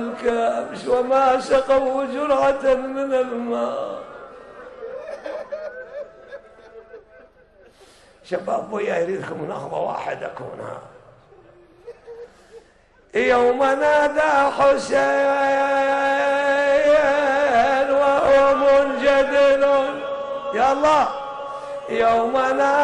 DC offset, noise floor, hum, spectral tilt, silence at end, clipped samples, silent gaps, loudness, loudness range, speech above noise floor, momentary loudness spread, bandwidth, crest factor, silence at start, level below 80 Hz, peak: under 0.1%; -54 dBFS; none; -4 dB/octave; 0 s; under 0.1%; none; -19 LUFS; 17 LU; 35 dB; 18 LU; 10.5 kHz; 14 dB; 0 s; -52 dBFS; -6 dBFS